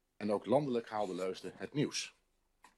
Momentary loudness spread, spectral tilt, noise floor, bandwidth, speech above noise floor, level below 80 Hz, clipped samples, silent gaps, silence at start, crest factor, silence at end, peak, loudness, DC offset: 9 LU; -5 dB/octave; -68 dBFS; 13 kHz; 32 dB; -78 dBFS; under 0.1%; none; 0.2 s; 20 dB; 0.7 s; -18 dBFS; -37 LUFS; under 0.1%